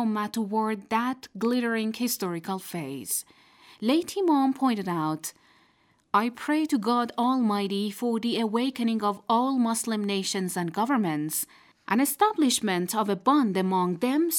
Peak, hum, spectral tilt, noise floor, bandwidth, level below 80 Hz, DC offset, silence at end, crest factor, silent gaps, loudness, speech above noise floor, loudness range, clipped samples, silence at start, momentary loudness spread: -10 dBFS; none; -4.5 dB/octave; -65 dBFS; 19 kHz; -76 dBFS; under 0.1%; 0 s; 18 dB; none; -26 LUFS; 39 dB; 3 LU; under 0.1%; 0 s; 7 LU